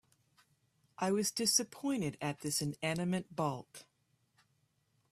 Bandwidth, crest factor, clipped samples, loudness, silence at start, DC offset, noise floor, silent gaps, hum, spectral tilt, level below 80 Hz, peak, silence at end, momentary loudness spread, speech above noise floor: 15.5 kHz; 24 dB; under 0.1%; -35 LUFS; 1 s; under 0.1%; -77 dBFS; none; none; -3.5 dB/octave; -74 dBFS; -14 dBFS; 1.3 s; 9 LU; 41 dB